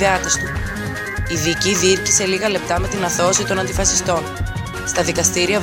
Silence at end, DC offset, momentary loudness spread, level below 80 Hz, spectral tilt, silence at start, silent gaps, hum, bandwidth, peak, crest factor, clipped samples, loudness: 0 s; under 0.1%; 10 LU; -32 dBFS; -3 dB/octave; 0 s; none; none; 17 kHz; -2 dBFS; 18 dB; under 0.1%; -18 LUFS